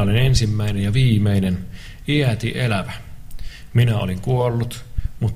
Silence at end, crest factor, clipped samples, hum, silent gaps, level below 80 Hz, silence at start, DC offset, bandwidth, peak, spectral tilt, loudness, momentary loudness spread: 0 s; 16 dB; under 0.1%; none; none; -32 dBFS; 0 s; under 0.1%; 15 kHz; -2 dBFS; -6.5 dB/octave; -20 LUFS; 17 LU